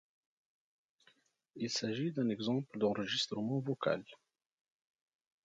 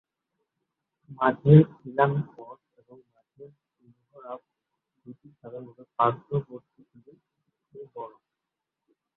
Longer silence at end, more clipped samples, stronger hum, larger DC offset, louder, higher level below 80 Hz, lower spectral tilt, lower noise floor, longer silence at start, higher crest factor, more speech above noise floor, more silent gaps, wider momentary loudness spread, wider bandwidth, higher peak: first, 1.3 s vs 1.1 s; neither; neither; neither; second, -36 LUFS vs -23 LUFS; second, -80 dBFS vs -64 dBFS; second, -5 dB/octave vs -12 dB/octave; second, -72 dBFS vs -86 dBFS; first, 1.55 s vs 1.1 s; about the same, 20 dB vs 24 dB; second, 36 dB vs 62 dB; neither; second, 3 LU vs 29 LU; first, 9.2 kHz vs 4 kHz; second, -20 dBFS vs -4 dBFS